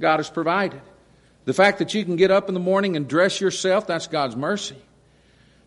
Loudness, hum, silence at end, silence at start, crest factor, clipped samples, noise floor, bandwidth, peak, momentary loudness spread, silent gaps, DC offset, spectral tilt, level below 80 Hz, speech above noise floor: -21 LUFS; none; 0.9 s; 0 s; 18 dB; under 0.1%; -56 dBFS; 11.5 kHz; -4 dBFS; 8 LU; none; under 0.1%; -4.5 dB/octave; -62 dBFS; 35 dB